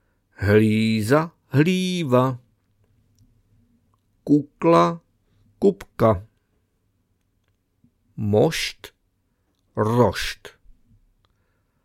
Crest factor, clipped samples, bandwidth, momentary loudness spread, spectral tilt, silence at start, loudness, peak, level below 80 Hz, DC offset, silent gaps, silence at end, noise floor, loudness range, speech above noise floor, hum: 20 dB; under 0.1%; 16.5 kHz; 16 LU; -6.5 dB/octave; 0.4 s; -21 LUFS; -2 dBFS; -50 dBFS; under 0.1%; none; 1.35 s; -69 dBFS; 6 LU; 50 dB; none